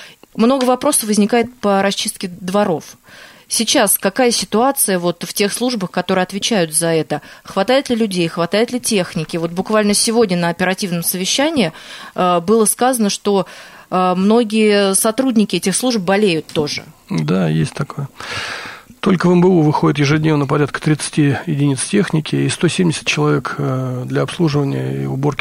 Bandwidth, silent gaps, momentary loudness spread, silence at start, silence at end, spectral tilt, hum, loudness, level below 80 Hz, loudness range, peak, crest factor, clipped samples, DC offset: 16 kHz; none; 9 LU; 0 s; 0.05 s; -4.5 dB/octave; none; -16 LUFS; -52 dBFS; 2 LU; -2 dBFS; 14 dB; under 0.1%; under 0.1%